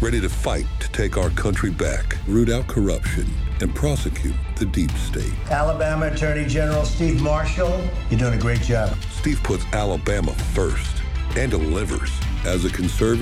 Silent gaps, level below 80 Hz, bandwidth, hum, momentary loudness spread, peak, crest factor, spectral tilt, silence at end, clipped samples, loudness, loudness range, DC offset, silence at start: none; -24 dBFS; 14 kHz; none; 5 LU; -6 dBFS; 14 dB; -6 dB/octave; 0 s; under 0.1%; -22 LUFS; 2 LU; under 0.1%; 0 s